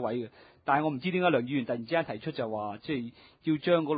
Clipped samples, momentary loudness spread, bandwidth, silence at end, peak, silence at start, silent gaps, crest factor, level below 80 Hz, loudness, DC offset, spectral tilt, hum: under 0.1%; 10 LU; 5 kHz; 0 s; -12 dBFS; 0 s; none; 18 dB; -68 dBFS; -31 LUFS; under 0.1%; -10.5 dB/octave; none